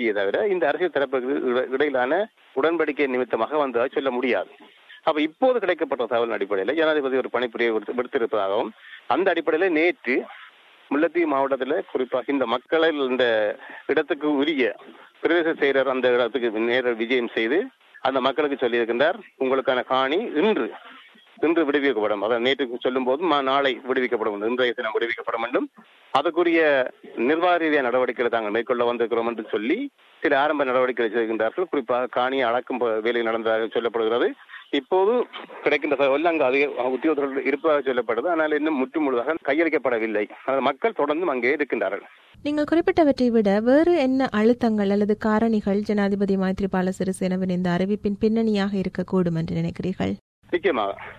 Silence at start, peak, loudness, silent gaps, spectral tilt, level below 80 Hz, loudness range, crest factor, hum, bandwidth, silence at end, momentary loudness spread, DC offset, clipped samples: 0 s; -4 dBFS; -23 LUFS; 50.21-50.42 s; -6.5 dB/octave; -58 dBFS; 3 LU; 20 dB; none; 11 kHz; 0 s; 6 LU; under 0.1%; under 0.1%